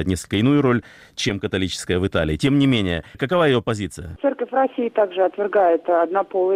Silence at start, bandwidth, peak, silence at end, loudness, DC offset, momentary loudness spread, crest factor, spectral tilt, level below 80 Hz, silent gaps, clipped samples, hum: 0 s; 15 kHz; -8 dBFS; 0 s; -20 LUFS; under 0.1%; 8 LU; 12 dB; -6 dB/octave; -44 dBFS; none; under 0.1%; none